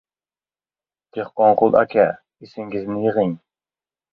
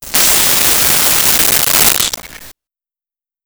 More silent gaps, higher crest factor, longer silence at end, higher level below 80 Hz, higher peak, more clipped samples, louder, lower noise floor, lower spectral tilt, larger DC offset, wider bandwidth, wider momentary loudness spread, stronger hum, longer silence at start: neither; first, 20 dB vs 12 dB; second, 0.75 s vs 0.95 s; second, -60 dBFS vs -38 dBFS; about the same, 0 dBFS vs 0 dBFS; neither; second, -19 LUFS vs -8 LUFS; about the same, under -90 dBFS vs under -90 dBFS; first, -9.5 dB/octave vs 0 dB/octave; neither; second, 5.2 kHz vs over 20 kHz; first, 19 LU vs 5 LU; neither; first, 1.15 s vs 0 s